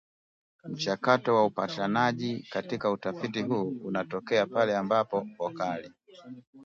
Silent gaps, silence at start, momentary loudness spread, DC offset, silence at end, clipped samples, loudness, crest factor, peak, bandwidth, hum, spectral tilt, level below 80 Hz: 6.47-6.53 s; 0.65 s; 11 LU; under 0.1%; 0 s; under 0.1%; -29 LUFS; 22 dB; -8 dBFS; 7.6 kHz; none; -6 dB/octave; -72 dBFS